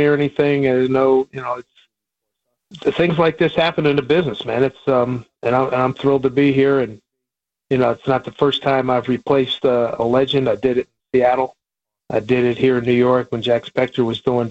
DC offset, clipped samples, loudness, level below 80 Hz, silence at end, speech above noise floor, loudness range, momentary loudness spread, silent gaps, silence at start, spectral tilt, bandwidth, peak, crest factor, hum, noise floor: under 0.1%; under 0.1%; -18 LUFS; -52 dBFS; 0 s; 67 dB; 2 LU; 7 LU; none; 0 s; -7.5 dB/octave; 8 kHz; -4 dBFS; 14 dB; none; -84 dBFS